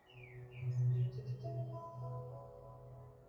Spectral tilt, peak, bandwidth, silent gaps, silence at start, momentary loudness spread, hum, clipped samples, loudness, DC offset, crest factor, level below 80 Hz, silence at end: -9.5 dB/octave; -28 dBFS; 6.4 kHz; none; 0.05 s; 19 LU; none; under 0.1%; -41 LUFS; under 0.1%; 14 dB; -68 dBFS; 0 s